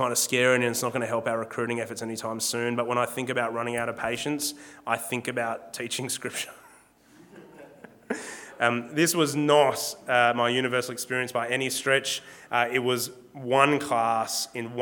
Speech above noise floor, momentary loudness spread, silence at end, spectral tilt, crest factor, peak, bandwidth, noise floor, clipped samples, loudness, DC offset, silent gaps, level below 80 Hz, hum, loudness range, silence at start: 30 dB; 11 LU; 0 s; -3 dB/octave; 24 dB; -2 dBFS; 19 kHz; -56 dBFS; under 0.1%; -26 LUFS; under 0.1%; none; -72 dBFS; none; 8 LU; 0 s